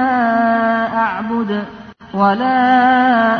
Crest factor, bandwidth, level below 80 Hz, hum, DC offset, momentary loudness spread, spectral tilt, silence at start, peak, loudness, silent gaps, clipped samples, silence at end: 12 dB; 6.4 kHz; -52 dBFS; none; under 0.1%; 10 LU; -7.5 dB/octave; 0 s; -2 dBFS; -14 LUFS; none; under 0.1%; 0 s